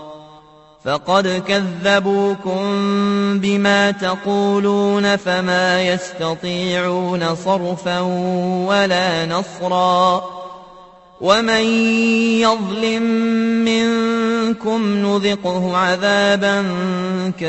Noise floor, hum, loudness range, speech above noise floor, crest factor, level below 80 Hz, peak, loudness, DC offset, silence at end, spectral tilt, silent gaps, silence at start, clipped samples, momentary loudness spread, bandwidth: -45 dBFS; none; 2 LU; 29 dB; 18 dB; -56 dBFS; 0 dBFS; -17 LUFS; under 0.1%; 0 s; -5 dB/octave; none; 0 s; under 0.1%; 7 LU; 8.4 kHz